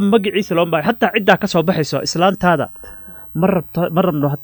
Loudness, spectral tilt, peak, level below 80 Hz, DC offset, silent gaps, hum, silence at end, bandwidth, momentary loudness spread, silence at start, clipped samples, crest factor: -16 LUFS; -6 dB/octave; 0 dBFS; -48 dBFS; under 0.1%; none; none; 0 s; 19.5 kHz; 12 LU; 0 s; under 0.1%; 16 dB